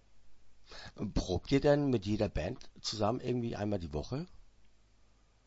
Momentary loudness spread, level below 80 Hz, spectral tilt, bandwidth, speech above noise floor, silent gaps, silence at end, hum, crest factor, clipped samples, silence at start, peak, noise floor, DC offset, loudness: 15 LU; -48 dBFS; -6 dB/octave; 7.6 kHz; 32 dB; none; 0.8 s; none; 22 dB; under 0.1%; 0.1 s; -14 dBFS; -65 dBFS; under 0.1%; -34 LUFS